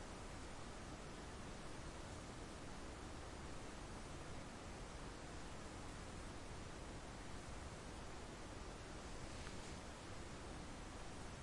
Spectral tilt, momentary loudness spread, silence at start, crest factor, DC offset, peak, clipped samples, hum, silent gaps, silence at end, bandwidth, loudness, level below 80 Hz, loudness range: -4.5 dB/octave; 1 LU; 0 s; 18 dB; under 0.1%; -34 dBFS; under 0.1%; none; none; 0 s; 11.5 kHz; -53 LUFS; -58 dBFS; 0 LU